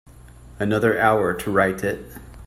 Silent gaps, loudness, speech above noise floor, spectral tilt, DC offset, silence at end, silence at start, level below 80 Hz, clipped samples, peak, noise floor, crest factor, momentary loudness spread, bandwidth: none; -21 LUFS; 23 dB; -6 dB/octave; under 0.1%; 0 s; 0.2 s; -46 dBFS; under 0.1%; -4 dBFS; -44 dBFS; 18 dB; 12 LU; 16 kHz